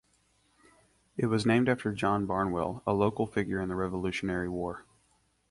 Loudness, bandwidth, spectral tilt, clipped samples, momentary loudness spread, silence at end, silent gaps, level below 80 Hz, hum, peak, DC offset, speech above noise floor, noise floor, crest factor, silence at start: -30 LUFS; 11.5 kHz; -7 dB/octave; under 0.1%; 9 LU; 0.7 s; none; -54 dBFS; none; -12 dBFS; under 0.1%; 41 dB; -70 dBFS; 20 dB; 1.15 s